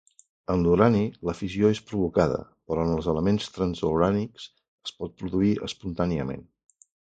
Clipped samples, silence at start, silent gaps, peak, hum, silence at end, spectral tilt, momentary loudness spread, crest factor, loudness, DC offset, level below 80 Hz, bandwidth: under 0.1%; 0.5 s; 4.68-4.78 s; -4 dBFS; none; 0.75 s; -7.5 dB/octave; 14 LU; 22 dB; -26 LUFS; under 0.1%; -46 dBFS; 9 kHz